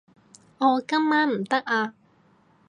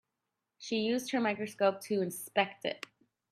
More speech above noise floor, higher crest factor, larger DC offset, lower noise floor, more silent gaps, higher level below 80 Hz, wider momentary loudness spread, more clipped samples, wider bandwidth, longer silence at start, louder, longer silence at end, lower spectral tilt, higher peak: second, 37 dB vs 54 dB; about the same, 18 dB vs 22 dB; neither; second, -60 dBFS vs -87 dBFS; neither; about the same, -78 dBFS vs -82 dBFS; second, 5 LU vs 11 LU; neither; second, 10.5 kHz vs 16 kHz; about the same, 0.6 s vs 0.6 s; first, -24 LUFS vs -33 LUFS; first, 0.75 s vs 0.55 s; about the same, -5 dB/octave vs -4 dB/octave; first, -8 dBFS vs -12 dBFS